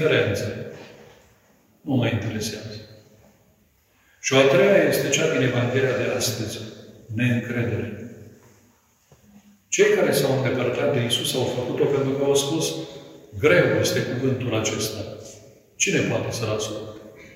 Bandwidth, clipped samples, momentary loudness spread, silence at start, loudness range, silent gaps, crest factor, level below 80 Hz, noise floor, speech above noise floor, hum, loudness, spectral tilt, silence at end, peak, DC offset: 16 kHz; under 0.1%; 20 LU; 0 s; 9 LU; none; 22 dB; -58 dBFS; -61 dBFS; 39 dB; none; -22 LUFS; -4.5 dB/octave; 0 s; -2 dBFS; under 0.1%